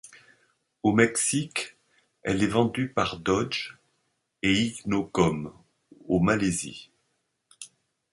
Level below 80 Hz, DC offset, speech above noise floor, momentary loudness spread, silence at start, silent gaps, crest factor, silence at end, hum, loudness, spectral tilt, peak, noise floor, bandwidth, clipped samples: -54 dBFS; under 0.1%; 50 dB; 18 LU; 0.05 s; none; 22 dB; 0.45 s; none; -26 LUFS; -4.5 dB/octave; -6 dBFS; -76 dBFS; 11.5 kHz; under 0.1%